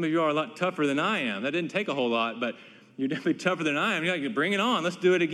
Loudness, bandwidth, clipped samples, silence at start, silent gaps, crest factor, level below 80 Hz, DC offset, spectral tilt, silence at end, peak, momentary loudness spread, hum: -27 LUFS; 12.5 kHz; under 0.1%; 0 s; none; 16 dB; -80 dBFS; under 0.1%; -5 dB/octave; 0 s; -12 dBFS; 7 LU; none